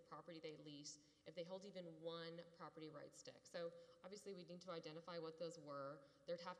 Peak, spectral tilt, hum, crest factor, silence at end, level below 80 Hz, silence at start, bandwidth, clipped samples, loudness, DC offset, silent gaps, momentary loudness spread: -38 dBFS; -4.5 dB/octave; none; 16 dB; 0 s; under -90 dBFS; 0 s; 11 kHz; under 0.1%; -56 LUFS; under 0.1%; none; 7 LU